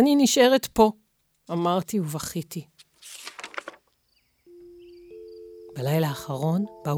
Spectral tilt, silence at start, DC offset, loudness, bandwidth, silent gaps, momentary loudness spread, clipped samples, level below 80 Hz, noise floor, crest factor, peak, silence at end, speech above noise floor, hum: -5 dB/octave; 0 s; under 0.1%; -24 LUFS; over 20 kHz; none; 25 LU; under 0.1%; -56 dBFS; -68 dBFS; 20 dB; -4 dBFS; 0 s; 46 dB; none